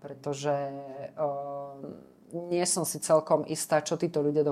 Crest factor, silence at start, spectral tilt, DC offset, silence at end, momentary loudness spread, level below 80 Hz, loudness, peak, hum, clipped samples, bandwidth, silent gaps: 18 dB; 0 s; -4.5 dB/octave; under 0.1%; 0 s; 16 LU; -76 dBFS; -29 LUFS; -10 dBFS; none; under 0.1%; 15.5 kHz; none